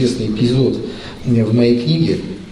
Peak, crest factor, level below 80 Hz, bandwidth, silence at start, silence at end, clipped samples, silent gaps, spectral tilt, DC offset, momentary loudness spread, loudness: -2 dBFS; 14 dB; -40 dBFS; 11.5 kHz; 0 s; 0 s; under 0.1%; none; -7.5 dB/octave; under 0.1%; 11 LU; -16 LUFS